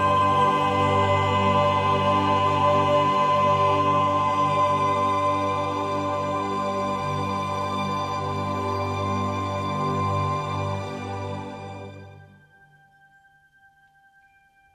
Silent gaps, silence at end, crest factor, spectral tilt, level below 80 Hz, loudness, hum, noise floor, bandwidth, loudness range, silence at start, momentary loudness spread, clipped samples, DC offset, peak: none; 2.5 s; 14 dB; -6 dB/octave; -58 dBFS; -23 LUFS; none; -59 dBFS; 12.5 kHz; 12 LU; 0 s; 11 LU; under 0.1%; under 0.1%; -10 dBFS